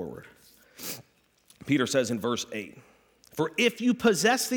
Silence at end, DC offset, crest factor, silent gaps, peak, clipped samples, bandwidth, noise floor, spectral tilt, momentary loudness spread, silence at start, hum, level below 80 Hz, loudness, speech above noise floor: 0 s; under 0.1%; 18 dB; none; -10 dBFS; under 0.1%; 19.5 kHz; -63 dBFS; -3.5 dB/octave; 18 LU; 0 s; none; -68 dBFS; -27 LUFS; 36 dB